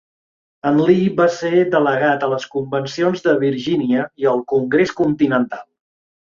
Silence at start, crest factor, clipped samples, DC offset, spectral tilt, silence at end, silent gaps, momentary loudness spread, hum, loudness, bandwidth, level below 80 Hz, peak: 0.65 s; 16 dB; under 0.1%; under 0.1%; -6.5 dB/octave; 0.7 s; none; 8 LU; none; -17 LUFS; 7.4 kHz; -58 dBFS; -2 dBFS